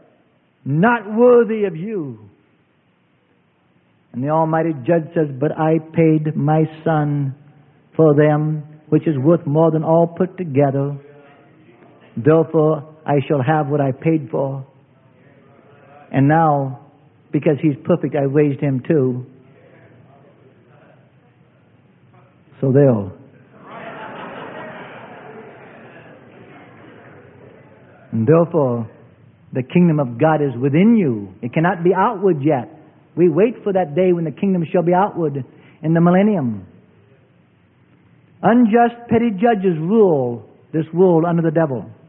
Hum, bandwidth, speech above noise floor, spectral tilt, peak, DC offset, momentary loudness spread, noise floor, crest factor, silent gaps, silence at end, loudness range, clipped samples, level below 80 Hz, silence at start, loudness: none; 3.6 kHz; 43 dB; -13.5 dB/octave; 0 dBFS; under 0.1%; 18 LU; -59 dBFS; 18 dB; none; 0.15 s; 6 LU; under 0.1%; -62 dBFS; 0.65 s; -17 LUFS